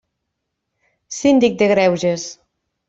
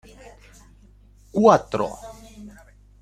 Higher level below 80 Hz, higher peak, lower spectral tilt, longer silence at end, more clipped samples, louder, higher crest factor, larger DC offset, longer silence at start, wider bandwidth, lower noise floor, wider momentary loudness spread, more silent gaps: second, -58 dBFS vs -50 dBFS; about the same, -2 dBFS vs -2 dBFS; second, -5 dB/octave vs -6.5 dB/octave; about the same, 0.55 s vs 0.55 s; neither; first, -16 LUFS vs -20 LUFS; second, 16 dB vs 22 dB; neither; second, 1.1 s vs 1.35 s; second, 8 kHz vs 14.5 kHz; first, -77 dBFS vs -51 dBFS; second, 15 LU vs 27 LU; neither